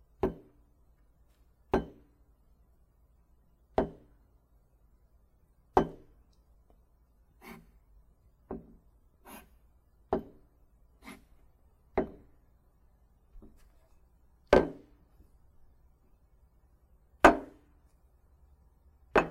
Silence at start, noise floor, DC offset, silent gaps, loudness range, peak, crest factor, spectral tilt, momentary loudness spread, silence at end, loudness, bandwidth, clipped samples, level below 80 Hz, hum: 0.25 s; -66 dBFS; under 0.1%; none; 13 LU; -2 dBFS; 34 dB; -6 dB/octave; 30 LU; 0 s; -30 LUFS; 15.5 kHz; under 0.1%; -52 dBFS; none